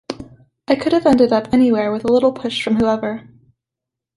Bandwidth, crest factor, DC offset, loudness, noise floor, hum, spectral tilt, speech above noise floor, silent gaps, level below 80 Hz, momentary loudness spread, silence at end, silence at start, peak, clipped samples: 11.5 kHz; 16 dB; under 0.1%; -16 LUFS; -84 dBFS; none; -6 dB/octave; 69 dB; none; -50 dBFS; 13 LU; 0.95 s; 0.1 s; -2 dBFS; under 0.1%